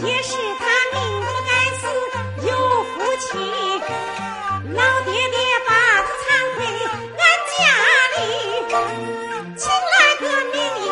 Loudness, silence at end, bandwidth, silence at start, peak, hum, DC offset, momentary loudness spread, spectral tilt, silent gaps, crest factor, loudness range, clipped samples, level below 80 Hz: -18 LUFS; 0 s; 11 kHz; 0 s; 0 dBFS; none; under 0.1%; 12 LU; -2 dB/octave; none; 18 dB; 5 LU; under 0.1%; -56 dBFS